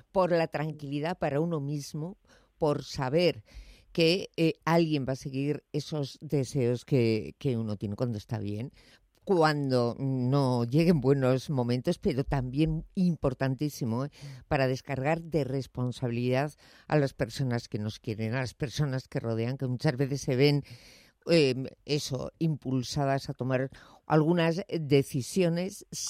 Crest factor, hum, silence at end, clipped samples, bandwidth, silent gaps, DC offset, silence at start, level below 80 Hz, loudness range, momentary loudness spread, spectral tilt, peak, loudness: 18 dB; none; 0 s; under 0.1%; 15 kHz; none; under 0.1%; 0.15 s; -54 dBFS; 4 LU; 10 LU; -6.5 dB/octave; -10 dBFS; -29 LUFS